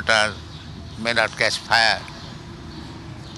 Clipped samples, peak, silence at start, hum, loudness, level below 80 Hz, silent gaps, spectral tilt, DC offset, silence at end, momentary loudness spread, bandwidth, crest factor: under 0.1%; -2 dBFS; 0 s; none; -20 LUFS; -46 dBFS; none; -2.5 dB/octave; under 0.1%; 0 s; 20 LU; 12 kHz; 22 dB